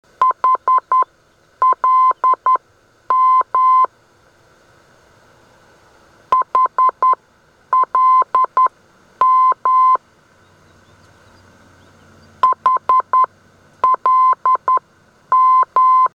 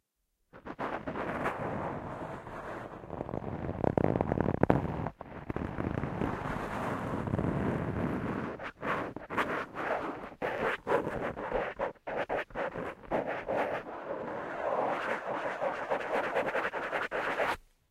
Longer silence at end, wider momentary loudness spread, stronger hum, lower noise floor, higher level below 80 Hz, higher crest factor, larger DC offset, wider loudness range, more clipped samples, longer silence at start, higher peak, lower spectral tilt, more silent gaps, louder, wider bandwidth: second, 0.1 s vs 0.3 s; second, 6 LU vs 10 LU; neither; second, -54 dBFS vs -79 dBFS; second, -64 dBFS vs -52 dBFS; second, 12 dB vs 28 dB; neither; about the same, 5 LU vs 3 LU; neither; second, 0.2 s vs 0.55 s; about the same, -4 dBFS vs -6 dBFS; second, -4 dB/octave vs -7.5 dB/octave; neither; first, -14 LUFS vs -34 LUFS; second, 5.4 kHz vs 15.5 kHz